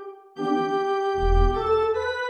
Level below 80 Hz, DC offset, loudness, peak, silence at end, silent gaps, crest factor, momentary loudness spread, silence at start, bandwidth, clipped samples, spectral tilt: -28 dBFS; under 0.1%; -24 LUFS; -8 dBFS; 0 s; none; 16 dB; 5 LU; 0 s; 6.6 kHz; under 0.1%; -7 dB/octave